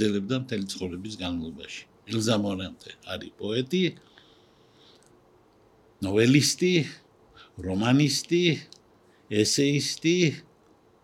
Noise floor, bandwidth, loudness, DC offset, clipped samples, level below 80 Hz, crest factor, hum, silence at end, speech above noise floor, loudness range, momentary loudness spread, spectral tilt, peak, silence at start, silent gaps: -60 dBFS; 16.5 kHz; -26 LUFS; under 0.1%; under 0.1%; -62 dBFS; 22 dB; none; 0.65 s; 34 dB; 8 LU; 16 LU; -4.5 dB/octave; -4 dBFS; 0 s; none